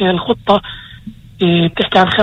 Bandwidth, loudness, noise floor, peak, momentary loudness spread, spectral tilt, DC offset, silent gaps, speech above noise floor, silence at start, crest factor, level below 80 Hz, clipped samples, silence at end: 7.4 kHz; -14 LUFS; -34 dBFS; 0 dBFS; 19 LU; -7 dB/octave; under 0.1%; none; 21 dB; 0 s; 14 dB; -42 dBFS; under 0.1%; 0 s